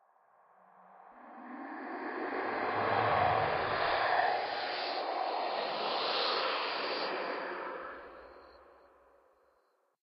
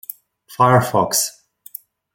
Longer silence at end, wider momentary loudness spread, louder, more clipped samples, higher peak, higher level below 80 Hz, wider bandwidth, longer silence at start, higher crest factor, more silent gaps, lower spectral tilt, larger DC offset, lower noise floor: first, 1.4 s vs 0.85 s; second, 18 LU vs 22 LU; second, -33 LUFS vs -16 LUFS; neither; second, -16 dBFS vs -2 dBFS; second, -68 dBFS vs -58 dBFS; second, 6 kHz vs 17 kHz; first, 0.9 s vs 0.5 s; about the same, 20 dB vs 18 dB; neither; first, -6 dB/octave vs -4 dB/octave; neither; first, -74 dBFS vs -40 dBFS